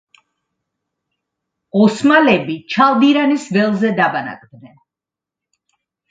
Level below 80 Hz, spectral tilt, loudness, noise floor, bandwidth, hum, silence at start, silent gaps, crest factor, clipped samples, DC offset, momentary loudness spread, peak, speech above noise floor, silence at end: -62 dBFS; -6 dB/octave; -14 LUFS; -87 dBFS; 9.2 kHz; none; 1.75 s; none; 16 dB; under 0.1%; under 0.1%; 10 LU; 0 dBFS; 72 dB; 1.45 s